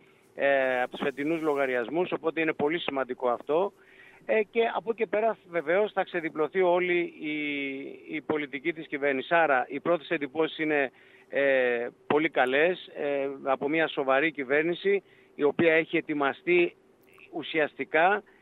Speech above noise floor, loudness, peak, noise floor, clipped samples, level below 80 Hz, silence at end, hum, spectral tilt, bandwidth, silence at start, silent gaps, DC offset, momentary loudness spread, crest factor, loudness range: 29 dB; -27 LUFS; -10 dBFS; -56 dBFS; under 0.1%; -76 dBFS; 0.2 s; none; -7 dB/octave; 4.5 kHz; 0.35 s; none; under 0.1%; 8 LU; 18 dB; 2 LU